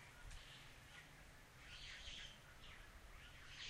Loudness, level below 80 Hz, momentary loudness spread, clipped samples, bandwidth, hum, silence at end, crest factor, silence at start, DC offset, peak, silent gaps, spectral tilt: -58 LUFS; -64 dBFS; 8 LU; under 0.1%; 16 kHz; none; 0 s; 18 dB; 0 s; under 0.1%; -40 dBFS; none; -2 dB/octave